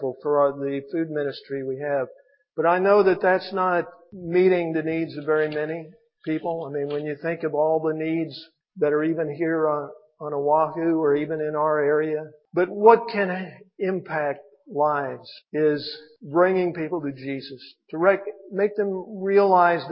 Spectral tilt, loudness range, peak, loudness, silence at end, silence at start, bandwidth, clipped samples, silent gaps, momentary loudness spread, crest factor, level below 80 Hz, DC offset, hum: -11 dB/octave; 4 LU; -2 dBFS; -23 LUFS; 0 s; 0 s; 5.6 kHz; under 0.1%; none; 15 LU; 22 dB; -72 dBFS; under 0.1%; none